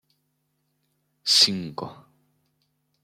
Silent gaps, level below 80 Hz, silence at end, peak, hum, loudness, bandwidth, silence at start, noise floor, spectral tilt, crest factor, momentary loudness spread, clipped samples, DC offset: none; -72 dBFS; 1.1 s; -6 dBFS; none; -19 LUFS; 16.5 kHz; 1.25 s; -74 dBFS; -1.5 dB/octave; 24 dB; 20 LU; under 0.1%; under 0.1%